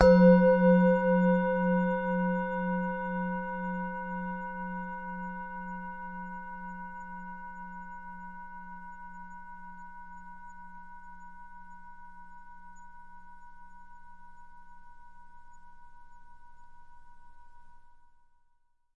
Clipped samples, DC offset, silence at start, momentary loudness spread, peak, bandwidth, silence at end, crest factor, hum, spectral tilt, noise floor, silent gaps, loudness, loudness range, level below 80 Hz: under 0.1%; under 0.1%; 0 s; 28 LU; -6 dBFS; 5.8 kHz; 1.05 s; 26 dB; none; -9.5 dB/octave; -67 dBFS; none; -28 LUFS; 26 LU; -52 dBFS